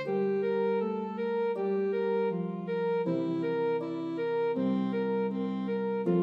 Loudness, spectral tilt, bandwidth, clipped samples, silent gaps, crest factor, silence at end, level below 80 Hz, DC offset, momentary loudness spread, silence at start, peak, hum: -31 LUFS; -9.5 dB/octave; 5.4 kHz; under 0.1%; none; 12 dB; 0 s; -84 dBFS; under 0.1%; 4 LU; 0 s; -16 dBFS; none